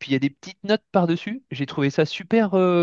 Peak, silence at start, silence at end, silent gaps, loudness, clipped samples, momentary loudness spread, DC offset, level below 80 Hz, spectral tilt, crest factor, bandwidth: -4 dBFS; 0 s; 0 s; none; -23 LUFS; under 0.1%; 10 LU; under 0.1%; -68 dBFS; -7 dB/octave; 18 dB; 7.4 kHz